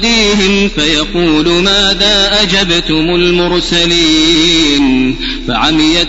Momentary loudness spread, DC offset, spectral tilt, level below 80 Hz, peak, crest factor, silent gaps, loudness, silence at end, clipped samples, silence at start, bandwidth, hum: 4 LU; under 0.1%; -3.5 dB/octave; -24 dBFS; 0 dBFS; 10 dB; none; -9 LUFS; 0 s; 0.2%; 0 s; 8 kHz; none